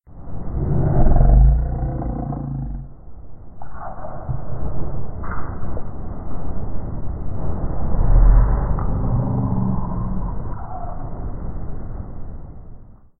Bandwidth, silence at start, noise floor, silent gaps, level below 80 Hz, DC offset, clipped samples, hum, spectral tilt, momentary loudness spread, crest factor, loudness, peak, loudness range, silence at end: 2.1 kHz; 0.1 s; -39 dBFS; none; -20 dBFS; under 0.1%; under 0.1%; none; -16 dB/octave; 19 LU; 16 dB; -23 LUFS; -2 dBFS; 10 LU; 0.25 s